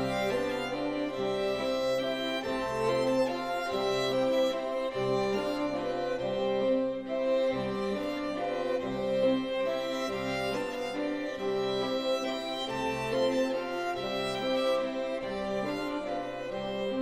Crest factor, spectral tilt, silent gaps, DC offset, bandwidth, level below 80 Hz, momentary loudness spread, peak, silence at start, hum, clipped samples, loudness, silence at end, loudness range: 14 dB; -5 dB/octave; none; 0.1%; 15.5 kHz; -58 dBFS; 5 LU; -16 dBFS; 0 s; none; under 0.1%; -31 LUFS; 0 s; 2 LU